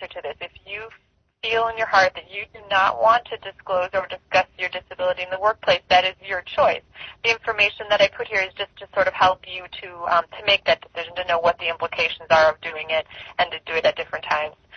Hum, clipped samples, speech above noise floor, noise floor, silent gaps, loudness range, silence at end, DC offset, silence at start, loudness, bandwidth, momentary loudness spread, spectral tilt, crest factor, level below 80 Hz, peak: none; under 0.1%; 35 dB; -57 dBFS; none; 2 LU; 0 s; under 0.1%; 0 s; -21 LUFS; 6.6 kHz; 15 LU; -2.5 dB/octave; 20 dB; -56 dBFS; -4 dBFS